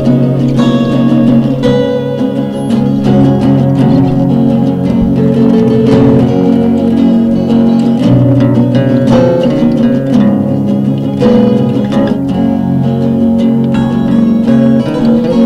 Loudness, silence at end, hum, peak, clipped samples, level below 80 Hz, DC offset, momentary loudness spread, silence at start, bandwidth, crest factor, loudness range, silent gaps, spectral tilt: -9 LUFS; 0 s; none; 0 dBFS; under 0.1%; -34 dBFS; under 0.1%; 4 LU; 0 s; 8 kHz; 8 dB; 2 LU; none; -9 dB/octave